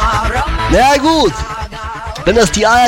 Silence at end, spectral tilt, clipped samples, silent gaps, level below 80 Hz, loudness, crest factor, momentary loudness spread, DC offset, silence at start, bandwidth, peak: 0 s; -4 dB/octave; under 0.1%; none; -22 dBFS; -12 LUFS; 10 dB; 14 LU; under 0.1%; 0 s; 16.5 kHz; -2 dBFS